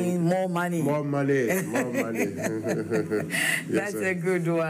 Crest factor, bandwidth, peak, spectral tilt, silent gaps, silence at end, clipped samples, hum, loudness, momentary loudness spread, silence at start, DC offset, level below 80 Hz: 14 dB; 16 kHz; -12 dBFS; -5.5 dB/octave; none; 0 s; under 0.1%; none; -26 LUFS; 4 LU; 0 s; under 0.1%; -72 dBFS